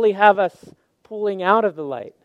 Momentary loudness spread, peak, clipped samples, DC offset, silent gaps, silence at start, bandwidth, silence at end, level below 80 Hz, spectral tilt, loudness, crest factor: 15 LU; 0 dBFS; under 0.1%; under 0.1%; none; 0 s; 8 kHz; 0.15 s; -74 dBFS; -6.5 dB/octave; -19 LUFS; 20 dB